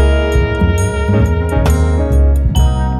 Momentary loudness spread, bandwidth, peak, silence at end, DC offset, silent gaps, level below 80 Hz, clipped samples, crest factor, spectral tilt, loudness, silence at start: 2 LU; 12 kHz; 0 dBFS; 0 s; under 0.1%; none; -14 dBFS; under 0.1%; 10 dB; -7 dB/octave; -13 LUFS; 0 s